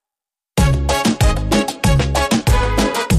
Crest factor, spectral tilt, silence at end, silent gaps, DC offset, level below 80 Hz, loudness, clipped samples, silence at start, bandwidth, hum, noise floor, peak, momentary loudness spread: 12 dB; -5 dB/octave; 0 s; none; under 0.1%; -20 dBFS; -16 LUFS; under 0.1%; 0.55 s; 15.5 kHz; none; -88 dBFS; -4 dBFS; 2 LU